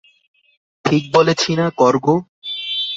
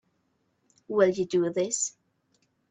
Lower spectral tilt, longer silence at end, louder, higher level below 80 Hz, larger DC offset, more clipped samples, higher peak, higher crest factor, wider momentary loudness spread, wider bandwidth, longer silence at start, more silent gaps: about the same, -5 dB/octave vs -4 dB/octave; second, 0 s vs 0.8 s; first, -17 LUFS vs -27 LUFS; first, -58 dBFS vs -72 dBFS; neither; neither; first, 0 dBFS vs -10 dBFS; about the same, 18 dB vs 20 dB; first, 10 LU vs 7 LU; second, 8 kHz vs 9.4 kHz; about the same, 0.85 s vs 0.9 s; first, 2.29-2.42 s vs none